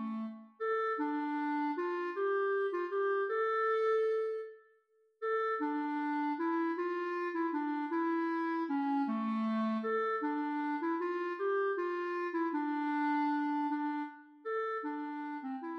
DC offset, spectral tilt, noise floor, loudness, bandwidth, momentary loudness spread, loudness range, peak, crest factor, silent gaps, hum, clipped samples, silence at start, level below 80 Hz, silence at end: under 0.1%; -7 dB/octave; -71 dBFS; -35 LUFS; 6.4 kHz; 8 LU; 2 LU; -22 dBFS; 12 dB; none; none; under 0.1%; 0 s; under -90 dBFS; 0 s